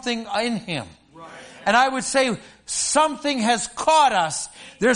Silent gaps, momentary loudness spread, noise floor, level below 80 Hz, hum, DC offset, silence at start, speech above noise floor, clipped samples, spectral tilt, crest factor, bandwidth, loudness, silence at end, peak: none; 15 LU; -42 dBFS; -58 dBFS; none; under 0.1%; 0.05 s; 21 dB; under 0.1%; -2.5 dB/octave; 18 dB; 11 kHz; -21 LUFS; 0 s; -4 dBFS